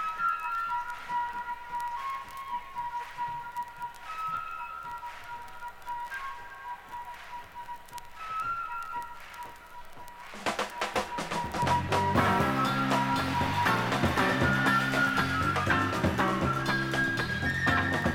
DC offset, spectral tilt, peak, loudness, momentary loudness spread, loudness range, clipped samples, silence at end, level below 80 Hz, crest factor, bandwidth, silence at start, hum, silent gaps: under 0.1%; -5 dB/octave; -12 dBFS; -29 LUFS; 17 LU; 12 LU; under 0.1%; 0 s; -52 dBFS; 20 dB; 17.5 kHz; 0 s; none; none